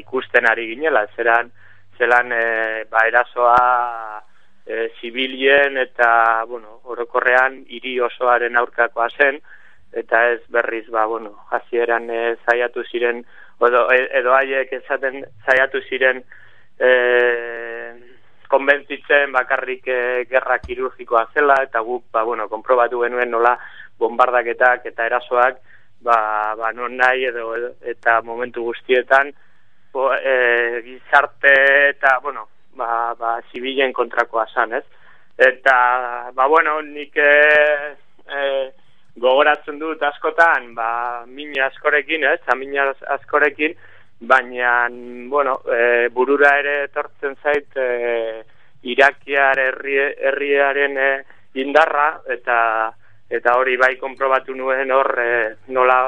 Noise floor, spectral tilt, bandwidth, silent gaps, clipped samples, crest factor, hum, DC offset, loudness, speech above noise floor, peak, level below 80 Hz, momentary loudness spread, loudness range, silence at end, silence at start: -50 dBFS; -4 dB/octave; 9 kHz; none; under 0.1%; 18 dB; none; 0.9%; -17 LUFS; 32 dB; 0 dBFS; -60 dBFS; 12 LU; 4 LU; 0 s; 0.1 s